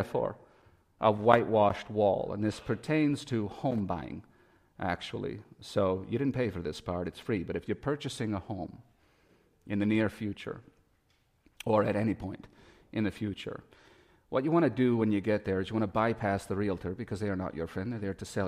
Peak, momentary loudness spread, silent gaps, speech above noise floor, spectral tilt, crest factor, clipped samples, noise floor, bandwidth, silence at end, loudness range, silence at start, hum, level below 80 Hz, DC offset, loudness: -6 dBFS; 13 LU; none; 40 dB; -7 dB/octave; 26 dB; under 0.1%; -71 dBFS; 14.5 kHz; 0 s; 6 LU; 0 s; none; -58 dBFS; under 0.1%; -31 LUFS